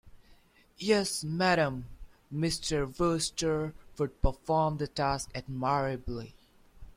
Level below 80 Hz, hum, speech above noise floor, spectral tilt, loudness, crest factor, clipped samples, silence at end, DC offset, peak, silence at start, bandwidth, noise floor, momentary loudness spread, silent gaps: -44 dBFS; none; 30 dB; -4.5 dB/octave; -31 LUFS; 20 dB; under 0.1%; 0.05 s; under 0.1%; -12 dBFS; 0.05 s; 16 kHz; -60 dBFS; 12 LU; none